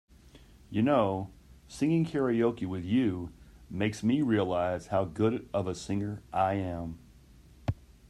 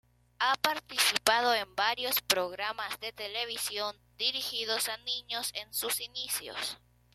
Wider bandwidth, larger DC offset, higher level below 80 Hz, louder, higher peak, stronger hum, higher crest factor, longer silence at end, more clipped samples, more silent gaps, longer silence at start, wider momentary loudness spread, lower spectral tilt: second, 12.5 kHz vs 16.5 kHz; neither; first, -56 dBFS vs -68 dBFS; about the same, -30 LUFS vs -31 LUFS; second, -14 dBFS vs -6 dBFS; neither; second, 18 dB vs 26 dB; about the same, 0.35 s vs 0.4 s; neither; neither; about the same, 0.35 s vs 0.4 s; about the same, 12 LU vs 10 LU; first, -7 dB/octave vs 0.5 dB/octave